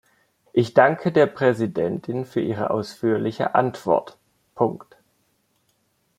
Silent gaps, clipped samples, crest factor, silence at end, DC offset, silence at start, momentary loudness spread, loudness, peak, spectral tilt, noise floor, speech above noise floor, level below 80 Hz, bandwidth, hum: none; under 0.1%; 22 dB; 1.4 s; under 0.1%; 0.55 s; 8 LU; -22 LUFS; -2 dBFS; -7.5 dB/octave; -68 dBFS; 47 dB; -64 dBFS; 14 kHz; none